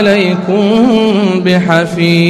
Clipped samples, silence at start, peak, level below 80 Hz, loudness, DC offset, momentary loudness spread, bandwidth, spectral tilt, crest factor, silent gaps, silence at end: under 0.1%; 0 s; 0 dBFS; -48 dBFS; -10 LUFS; under 0.1%; 3 LU; 12.5 kHz; -6.5 dB/octave; 10 dB; none; 0 s